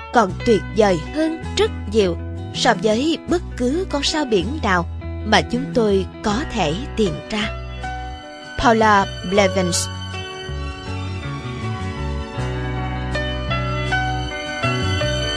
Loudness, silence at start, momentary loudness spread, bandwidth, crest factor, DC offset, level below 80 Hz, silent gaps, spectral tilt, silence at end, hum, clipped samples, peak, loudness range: -20 LUFS; 0 s; 11 LU; 11 kHz; 18 dB; under 0.1%; -32 dBFS; none; -5 dB/octave; 0 s; none; under 0.1%; -2 dBFS; 6 LU